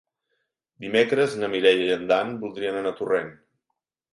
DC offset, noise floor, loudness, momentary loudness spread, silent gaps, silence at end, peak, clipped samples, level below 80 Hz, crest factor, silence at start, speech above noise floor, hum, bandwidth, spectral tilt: under 0.1%; -81 dBFS; -23 LUFS; 10 LU; none; 0.8 s; -4 dBFS; under 0.1%; -68 dBFS; 20 dB; 0.8 s; 58 dB; none; 11.5 kHz; -5 dB/octave